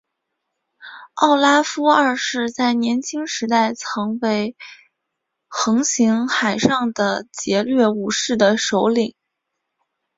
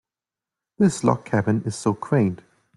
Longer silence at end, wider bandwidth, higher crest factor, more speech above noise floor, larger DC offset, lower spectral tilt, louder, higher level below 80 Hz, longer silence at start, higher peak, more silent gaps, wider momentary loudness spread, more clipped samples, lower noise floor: first, 1.05 s vs 0.4 s; second, 7.8 kHz vs 11.5 kHz; about the same, 18 dB vs 20 dB; second, 60 dB vs 68 dB; neither; second, -3.5 dB/octave vs -7 dB/octave; first, -18 LUFS vs -22 LUFS; about the same, -62 dBFS vs -58 dBFS; about the same, 0.8 s vs 0.8 s; about the same, -2 dBFS vs -4 dBFS; neither; first, 9 LU vs 6 LU; neither; second, -78 dBFS vs -90 dBFS